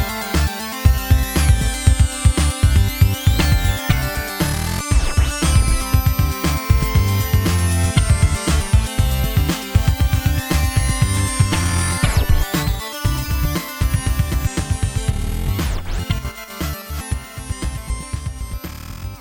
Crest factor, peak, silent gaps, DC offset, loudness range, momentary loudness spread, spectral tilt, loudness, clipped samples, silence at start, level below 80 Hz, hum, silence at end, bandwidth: 18 dB; 0 dBFS; none; under 0.1%; 7 LU; 10 LU; -4.5 dB/octave; -19 LUFS; under 0.1%; 0 s; -20 dBFS; none; 0 s; 18.5 kHz